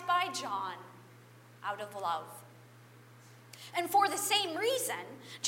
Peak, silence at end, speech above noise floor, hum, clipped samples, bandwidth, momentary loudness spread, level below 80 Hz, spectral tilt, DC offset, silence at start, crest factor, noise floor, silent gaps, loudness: -16 dBFS; 0 s; 23 dB; 60 Hz at -60 dBFS; under 0.1%; 16 kHz; 21 LU; -88 dBFS; -1.5 dB/octave; under 0.1%; 0 s; 20 dB; -57 dBFS; none; -33 LUFS